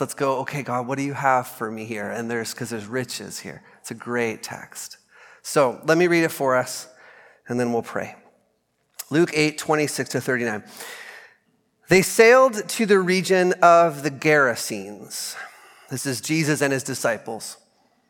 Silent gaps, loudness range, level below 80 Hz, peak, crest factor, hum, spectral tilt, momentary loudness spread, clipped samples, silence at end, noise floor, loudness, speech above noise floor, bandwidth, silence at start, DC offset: none; 10 LU; -68 dBFS; 0 dBFS; 22 dB; none; -4.5 dB/octave; 20 LU; under 0.1%; 0.55 s; -69 dBFS; -21 LUFS; 47 dB; 17.5 kHz; 0 s; under 0.1%